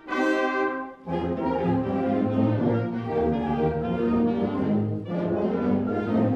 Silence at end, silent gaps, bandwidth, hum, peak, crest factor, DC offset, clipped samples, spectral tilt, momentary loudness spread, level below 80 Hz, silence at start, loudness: 0 s; none; 8.2 kHz; none; -12 dBFS; 14 dB; under 0.1%; under 0.1%; -8.5 dB/octave; 5 LU; -48 dBFS; 0.05 s; -25 LUFS